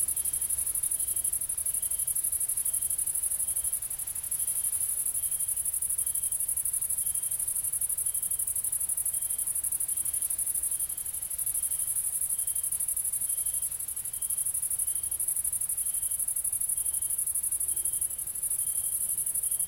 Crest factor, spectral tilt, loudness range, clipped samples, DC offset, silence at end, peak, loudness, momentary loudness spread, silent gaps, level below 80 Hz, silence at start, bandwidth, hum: 18 dB; 0.5 dB/octave; 1 LU; under 0.1%; under 0.1%; 0 s; -14 dBFS; -27 LUFS; 2 LU; none; -58 dBFS; 0 s; 17 kHz; none